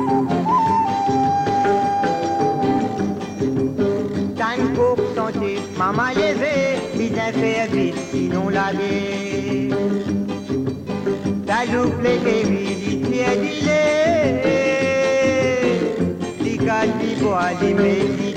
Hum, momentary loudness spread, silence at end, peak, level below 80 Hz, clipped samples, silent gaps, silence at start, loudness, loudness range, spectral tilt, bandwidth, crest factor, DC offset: none; 6 LU; 0 s; -6 dBFS; -50 dBFS; under 0.1%; none; 0 s; -20 LUFS; 3 LU; -6 dB/octave; 10.5 kHz; 12 dB; under 0.1%